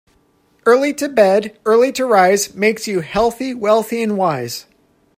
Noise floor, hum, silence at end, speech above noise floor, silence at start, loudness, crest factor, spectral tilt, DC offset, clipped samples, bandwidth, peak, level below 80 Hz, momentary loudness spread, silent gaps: -57 dBFS; none; 0.55 s; 42 dB; 0.65 s; -16 LUFS; 16 dB; -4 dB/octave; under 0.1%; under 0.1%; 16 kHz; 0 dBFS; -50 dBFS; 8 LU; none